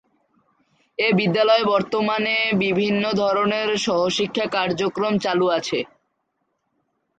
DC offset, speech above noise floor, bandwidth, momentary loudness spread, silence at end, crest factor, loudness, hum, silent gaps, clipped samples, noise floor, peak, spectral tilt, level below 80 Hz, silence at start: under 0.1%; 53 dB; 9.2 kHz; 5 LU; 1.3 s; 16 dB; -20 LUFS; none; none; under 0.1%; -73 dBFS; -6 dBFS; -5 dB/octave; -62 dBFS; 1 s